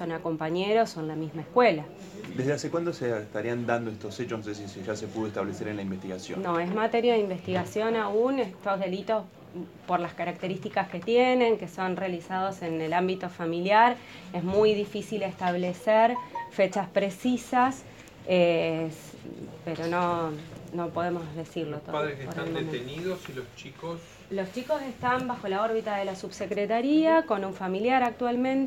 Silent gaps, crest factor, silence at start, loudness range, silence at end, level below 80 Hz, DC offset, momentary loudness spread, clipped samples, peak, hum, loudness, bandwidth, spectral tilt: none; 20 dB; 0 s; 7 LU; 0 s; -64 dBFS; under 0.1%; 14 LU; under 0.1%; -8 dBFS; none; -28 LUFS; 16.5 kHz; -6 dB/octave